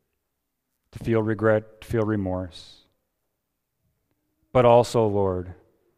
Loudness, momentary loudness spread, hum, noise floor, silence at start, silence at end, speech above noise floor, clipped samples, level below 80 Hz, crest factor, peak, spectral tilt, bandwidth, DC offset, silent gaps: -23 LUFS; 15 LU; none; -80 dBFS; 0.95 s; 0.45 s; 58 dB; under 0.1%; -52 dBFS; 22 dB; -4 dBFS; -7 dB/octave; 14.5 kHz; under 0.1%; none